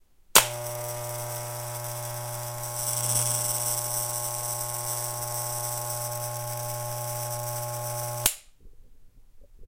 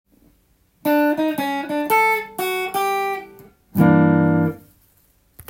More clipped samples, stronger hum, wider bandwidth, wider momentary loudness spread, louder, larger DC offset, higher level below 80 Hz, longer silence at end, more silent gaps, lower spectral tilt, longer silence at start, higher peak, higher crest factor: neither; neither; about the same, 17 kHz vs 17 kHz; about the same, 10 LU vs 11 LU; second, -28 LUFS vs -19 LUFS; neither; about the same, -56 dBFS vs -56 dBFS; second, 0 s vs 0.9 s; neither; second, -1.5 dB/octave vs -6.5 dB/octave; second, 0.3 s vs 0.85 s; about the same, 0 dBFS vs -2 dBFS; first, 30 dB vs 18 dB